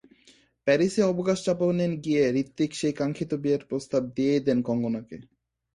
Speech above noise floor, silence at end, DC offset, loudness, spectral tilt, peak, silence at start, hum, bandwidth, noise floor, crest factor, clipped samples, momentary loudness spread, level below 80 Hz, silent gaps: 34 dB; 0.5 s; under 0.1%; -26 LUFS; -6.5 dB/octave; -8 dBFS; 0.65 s; none; 11.5 kHz; -60 dBFS; 18 dB; under 0.1%; 6 LU; -62 dBFS; none